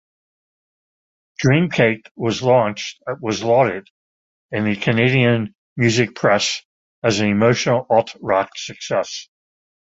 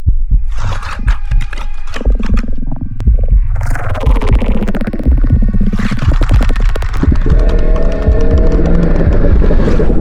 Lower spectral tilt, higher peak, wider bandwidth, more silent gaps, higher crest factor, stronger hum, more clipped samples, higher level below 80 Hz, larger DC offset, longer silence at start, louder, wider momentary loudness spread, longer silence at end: second, -5.5 dB/octave vs -8 dB/octave; about the same, -2 dBFS vs 0 dBFS; first, 8 kHz vs 7.2 kHz; first, 2.11-2.15 s, 3.90-4.49 s, 5.55-5.76 s, 6.65-7.02 s vs none; first, 18 dB vs 8 dB; neither; neither; second, -54 dBFS vs -10 dBFS; neither; first, 1.4 s vs 0 s; second, -18 LUFS vs -14 LUFS; first, 12 LU vs 7 LU; first, 0.7 s vs 0 s